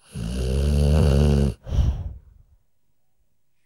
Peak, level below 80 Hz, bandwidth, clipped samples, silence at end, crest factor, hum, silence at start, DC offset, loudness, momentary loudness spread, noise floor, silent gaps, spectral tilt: -8 dBFS; -26 dBFS; 12.5 kHz; under 0.1%; 1.5 s; 16 dB; none; 0.15 s; under 0.1%; -22 LUFS; 13 LU; -74 dBFS; none; -7.5 dB/octave